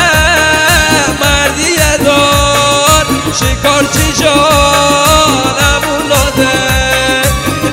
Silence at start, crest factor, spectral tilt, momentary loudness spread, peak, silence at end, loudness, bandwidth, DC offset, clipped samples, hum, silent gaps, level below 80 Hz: 0 s; 8 dB; -3 dB/octave; 4 LU; 0 dBFS; 0 s; -8 LUFS; over 20 kHz; under 0.1%; 1%; none; none; -22 dBFS